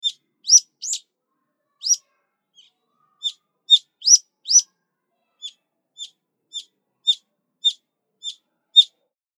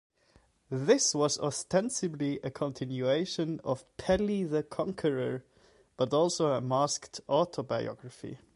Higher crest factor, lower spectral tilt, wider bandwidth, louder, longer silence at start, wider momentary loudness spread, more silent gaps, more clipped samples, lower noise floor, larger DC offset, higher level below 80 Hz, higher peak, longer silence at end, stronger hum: about the same, 24 dB vs 20 dB; second, 8 dB/octave vs -4.5 dB/octave; first, 15 kHz vs 11.5 kHz; first, -17 LUFS vs -31 LUFS; second, 0.05 s vs 0.7 s; first, 24 LU vs 9 LU; neither; neither; first, -76 dBFS vs -66 dBFS; neither; second, under -90 dBFS vs -60 dBFS; first, 0 dBFS vs -12 dBFS; first, 0.55 s vs 0.2 s; neither